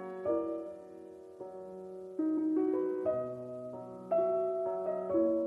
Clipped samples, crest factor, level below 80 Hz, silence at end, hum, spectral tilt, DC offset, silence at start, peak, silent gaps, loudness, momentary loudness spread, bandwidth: under 0.1%; 14 dB; -74 dBFS; 0 s; none; -9.5 dB/octave; under 0.1%; 0 s; -20 dBFS; none; -34 LUFS; 16 LU; 3.5 kHz